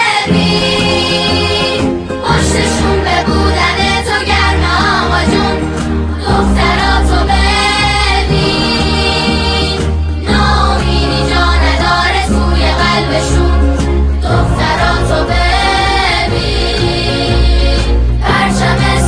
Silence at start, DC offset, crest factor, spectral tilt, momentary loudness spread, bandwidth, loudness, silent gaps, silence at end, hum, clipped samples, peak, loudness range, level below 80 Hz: 0 s; under 0.1%; 10 dB; -5 dB/octave; 3 LU; 10.5 kHz; -11 LUFS; none; 0 s; none; under 0.1%; 0 dBFS; 1 LU; -16 dBFS